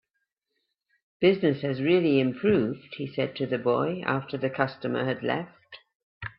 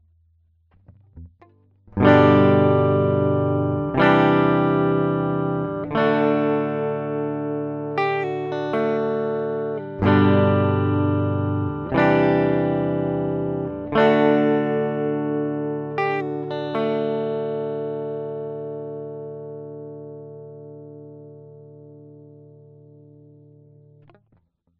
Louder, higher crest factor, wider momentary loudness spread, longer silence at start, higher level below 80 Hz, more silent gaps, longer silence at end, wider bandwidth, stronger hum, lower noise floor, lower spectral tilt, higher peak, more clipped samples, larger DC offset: second, -26 LUFS vs -21 LUFS; about the same, 20 dB vs 20 dB; second, 10 LU vs 18 LU; first, 1.2 s vs 0.9 s; second, -64 dBFS vs -52 dBFS; first, 5.95-6.21 s vs none; second, 0.1 s vs 2.5 s; second, 5.6 kHz vs 6.6 kHz; neither; first, -80 dBFS vs -63 dBFS; about the same, -10.5 dB/octave vs -9.5 dB/octave; second, -8 dBFS vs -2 dBFS; neither; neither